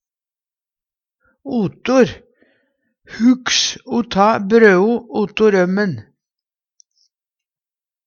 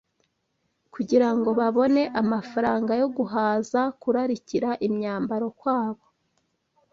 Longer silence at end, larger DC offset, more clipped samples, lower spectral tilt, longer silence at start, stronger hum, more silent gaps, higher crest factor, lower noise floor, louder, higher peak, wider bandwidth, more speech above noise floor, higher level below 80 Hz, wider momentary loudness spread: first, 2.05 s vs 1 s; neither; neither; second, -4.5 dB/octave vs -6.5 dB/octave; first, 1.45 s vs 0.95 s; neither; neither; about the same, 18 dB vs 18 dB; first, under -90 dBFS vs -74 dBFS; first, -15 LUFS vs -24 LUFS; first, 0 dBFS vs -8 dBFS; about the same, 7.4 kHz vs 7.4 kHz; first, over 75 dB vs 51 dB; first, -54 dBFS vs -66 dBFS; first, 11 LU vs 6 LU